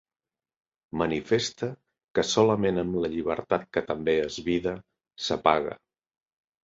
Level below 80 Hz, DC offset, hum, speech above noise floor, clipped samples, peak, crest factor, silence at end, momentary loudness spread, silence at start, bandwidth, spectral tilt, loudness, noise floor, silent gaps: -56 dBFS; under 0.1%; none; over 64 dB; under 0.1%; -4 dBFS; 24 dB; 0.9 s; 13 LU; 0.95 s; 7.8 kHz; -5 dB/octave; -27 LUFS; under -90 dBFS; 2.04-2.08 s